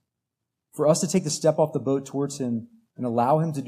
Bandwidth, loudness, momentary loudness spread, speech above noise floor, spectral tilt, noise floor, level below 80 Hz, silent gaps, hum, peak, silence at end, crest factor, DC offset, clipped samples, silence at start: 15 kHz; -24 LUFS; 9 LU; 60 dB; -5.5 dB/octave; -84 dBFS; -74 dBFS; none; none; -6 dBFS; 0 s; 18 dB; under 0.1%; under 0.1%; 0.75 s